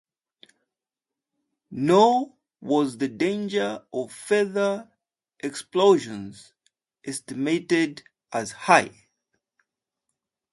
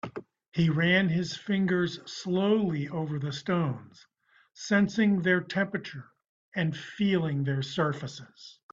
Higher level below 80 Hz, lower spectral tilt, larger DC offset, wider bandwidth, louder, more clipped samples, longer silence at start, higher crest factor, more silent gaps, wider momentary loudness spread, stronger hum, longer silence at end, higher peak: second, -70 dBFS vs -64 dBFS; second, -4.5 dB/octave vs -6.5 dB/octave; neither; first, 11.5 kHz vs 7.6 kHz; first, -24 LUFS vs -28 LUFS; neither; first, 1.7 s vs 0.05 s; first, 24 dB vs 18 dB; second, none vs 0.48-0.52 s, 6.29-6.52 s; about the same, 17 LU vs 17 LU; neither; first, 1.65 s vs 0.2 s; first, -2 dBFS vs -10 dBFS